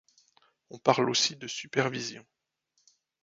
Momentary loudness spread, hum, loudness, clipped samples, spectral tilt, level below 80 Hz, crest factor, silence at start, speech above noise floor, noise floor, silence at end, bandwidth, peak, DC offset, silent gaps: 13 LU; none; -28 LUFS; under 0.1%; -3 dB/octave; -74 dBFS; 28 dB; 0.7 s; 47 dB; -76 dBFS; 1 s; 7.8 kHz; -6 dBFS; under 0.1%; none